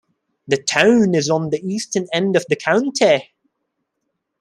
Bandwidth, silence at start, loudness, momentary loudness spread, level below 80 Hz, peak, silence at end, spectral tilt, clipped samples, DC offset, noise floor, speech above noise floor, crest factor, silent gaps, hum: 12 kHz; 0.5 s; -17 LUFS; 9 LU; -62 dBFS; 0 dBFS; 1.2 s; -4.5 dB/octave; under 0.1%; under 0.1%; -75 dBFS; 58 dB; 18 dB; none; none